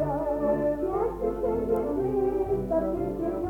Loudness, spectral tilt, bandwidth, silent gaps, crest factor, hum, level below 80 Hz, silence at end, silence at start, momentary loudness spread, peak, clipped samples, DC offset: -27 LUFS; -9.5 dB/octave; 17.5 kHz; none; 12 dB; none; -42 dBFS; 0 s; 0 s; 3 LU; -16 dBFS; under 0.1%; under 0.1%